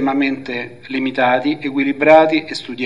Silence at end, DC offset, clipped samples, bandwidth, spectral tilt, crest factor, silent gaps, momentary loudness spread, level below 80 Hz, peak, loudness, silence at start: 0 s; 0.5%; under 0.1%; 10.5 kHz; -5.5 dB/octave; 16 dB; none; 15 LU; -64 dBFS; 0 dBFS; -16 LUFS; 0 s